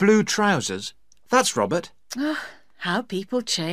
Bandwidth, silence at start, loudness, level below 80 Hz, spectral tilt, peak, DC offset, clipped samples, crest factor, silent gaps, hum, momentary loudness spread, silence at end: 15.5 kHz; 0 s; -23 LUFS; -64 dBFS; -3.5 dB/octave; -4 dBFS; 0.3%; under 0.1%; 20 dB; none; none; 13 LU; 0 s